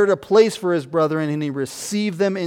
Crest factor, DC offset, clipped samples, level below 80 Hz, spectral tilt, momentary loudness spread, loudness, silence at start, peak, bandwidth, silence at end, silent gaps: 16 dB; under 0.1%; under 0.1%; -64 dBFS; -5.5 dB/octave; 9 LU; -20 LUFS; 0 s; -4 dBFS; 16.5 kHz; 0 s; none